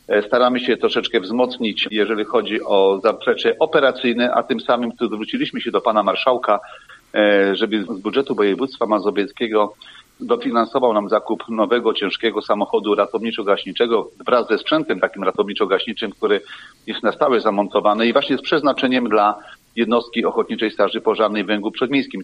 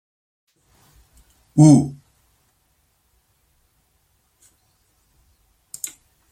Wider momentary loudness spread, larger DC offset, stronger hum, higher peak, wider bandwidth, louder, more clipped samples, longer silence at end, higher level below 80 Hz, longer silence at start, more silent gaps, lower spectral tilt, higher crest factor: second, 6 LU vs 20 LU; neither; neither; about the same, 0 dBFS vs -2 dBFS; second, 9.6 kHz vs 15 kHz; about the same, -19 LUFS vs -17 LUFS; neither; second, 0 s vs 4.4 s; about the same, -62 dBFS vs -58 dBFS; second, 0.1 s vs 1.55 s; neither; second, -6 dB/octave vs -7.5 dB/octave; about the same, 18 dB vs 22 dB